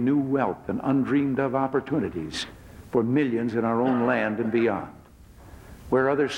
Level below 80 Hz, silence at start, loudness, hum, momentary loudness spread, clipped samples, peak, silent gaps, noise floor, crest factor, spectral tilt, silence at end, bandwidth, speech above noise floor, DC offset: -54 dBFS; 0 s; -25 LUFS; none; 8 LU; under 0.1%; -10 dBFS; none; -49 dBFS; 16 dB; -7 dB/octave; 0 s; 11.5 kHz; 25 dB; under 0.1%